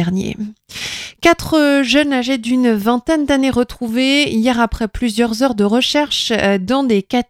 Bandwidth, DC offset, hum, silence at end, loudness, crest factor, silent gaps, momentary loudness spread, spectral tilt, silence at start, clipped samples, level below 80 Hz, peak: 16 kHz; under 0.1%; none; 0.05 s; -15 LUFS; 16 dB; none; 8 LU; -4.5 dB/octave; 0 s; under 0.1%; -38 dBFS; 0 dBFS